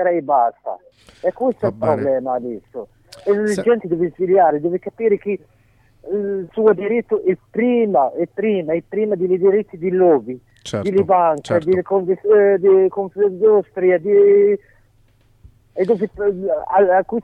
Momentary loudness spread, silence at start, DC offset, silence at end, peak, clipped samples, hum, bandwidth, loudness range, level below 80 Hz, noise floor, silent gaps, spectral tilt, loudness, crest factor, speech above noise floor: 11 LU; 0 s; under 0.1%; 0 s; -2 dBFS; under 0.1%; none; 10 kHz; 5 LU; -56 dBFS; -55 dBFS; none; -7.5 dB/octave; -17 LUFS; 16 dB; 38 dB